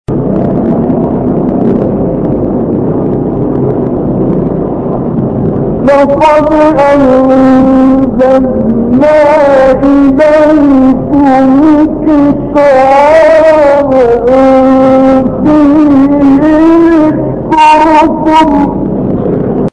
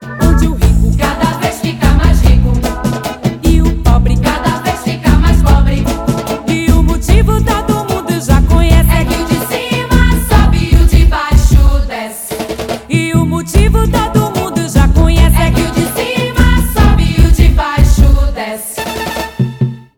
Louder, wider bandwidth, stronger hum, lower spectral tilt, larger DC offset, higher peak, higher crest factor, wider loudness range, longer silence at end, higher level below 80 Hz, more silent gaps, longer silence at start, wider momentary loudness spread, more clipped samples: first, -6 LUFS vs -12 LUFS; second, 9.6 kHz vs 17.5 kHz; neither; first, -8 dB/octave vs -6 dB/octave; neither; about the same, 0 dBFS vs 0 dBFS; about the same, 6 dB vs 10 dB; first, 6 LU vs 2 LU; about the same, 0.05 s vs 0.15 s; second, -28 dBFS vs -12 dBFS; neither; about the same, 0.1 s vs 0 s; about the same, 7 LU vs 8 LU; about the same, 1% vs 2%